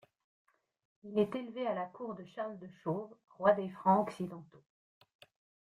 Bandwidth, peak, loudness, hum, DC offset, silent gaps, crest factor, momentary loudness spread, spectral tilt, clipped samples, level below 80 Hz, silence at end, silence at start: 11.5 kHz; -14 dBFS; -35 LUFS; none; under 0.1%; none; 24 dB; 14 LU; -8 dB/octave; under 0.1%; -80 dBFS; 1.15 s; 1.05 s